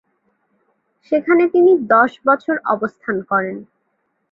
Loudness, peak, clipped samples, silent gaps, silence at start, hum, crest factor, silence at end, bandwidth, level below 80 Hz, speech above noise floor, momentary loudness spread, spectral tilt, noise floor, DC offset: -16 LUFS; -2 dBFS; under 0.1%; none; 1.1 s; none; 16 dB; 0.7 s; 5.2 kHz; -64 dBFS; 53 dB; 11 LU; -8.5 dB/octave; -69 dBFS; under 0.1%